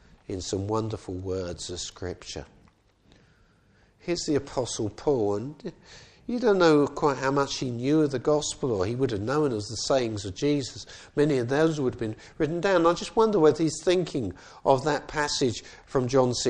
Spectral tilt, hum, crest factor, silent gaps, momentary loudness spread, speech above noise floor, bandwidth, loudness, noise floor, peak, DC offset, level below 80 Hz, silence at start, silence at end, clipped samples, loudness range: -5 dB/octave; none; 20 dB; none; 13 LU; 35 dB; 10 kHz; -26 LUFS; -61 dBFS; -6 dBFS; under 0.1%; -54 dBFS; 0.3 s; 0 s; under 0.1%; 9 LU